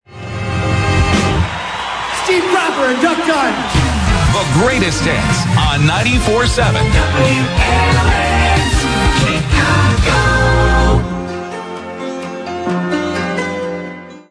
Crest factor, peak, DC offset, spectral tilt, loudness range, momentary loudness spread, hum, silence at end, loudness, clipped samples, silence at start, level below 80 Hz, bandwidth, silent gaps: 14 dB; 0 dBFS; under 0.1%; -5 dB/octave; 4 LU; 12 LU; none; 0.1 s; -14 LUFS; under 0.1%; 0.1 s; -22 dBFS; 11 kHz; none